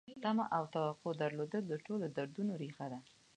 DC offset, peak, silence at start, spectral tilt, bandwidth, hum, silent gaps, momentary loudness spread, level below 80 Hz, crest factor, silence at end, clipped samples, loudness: under 0.1%; -22 dBFS; 0.05 s; -7 dB/octave; 9.8 kHz; none; none; 9 LU; -84 dBFS; 16 dB; 0.35 s; under 0.1%; -40 LUFS